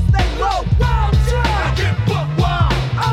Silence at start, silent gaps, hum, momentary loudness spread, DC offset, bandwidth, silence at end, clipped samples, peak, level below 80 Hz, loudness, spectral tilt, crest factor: 0 s; none; none; 2 LU; under 0.1%; 13 kHz; 0 s; under 0.1%; -2 dBFS; -20 dBFS; -17 LUFS; -6 dB/octave; 12 dB